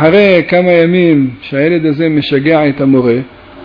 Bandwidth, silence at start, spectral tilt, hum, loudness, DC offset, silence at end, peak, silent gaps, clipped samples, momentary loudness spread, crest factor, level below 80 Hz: 5.2 kHz; 0 s; -9.5 dB/octave; none; -10 LUFS; under 0.1%; 0 s; 0 dBFS; none; under 0.1%; 6 LU; 10 dB; -44 dBFS